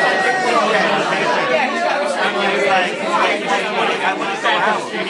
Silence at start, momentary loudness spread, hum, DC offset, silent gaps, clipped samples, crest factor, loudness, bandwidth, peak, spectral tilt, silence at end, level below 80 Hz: 0 s; 3 LU; none; under 0.1%; none; under 0.1%; 14 dB; -16 LUFS; 11.5 kHz; -4 dBFS; -3 dB/octave; 0 s; -76 dBFS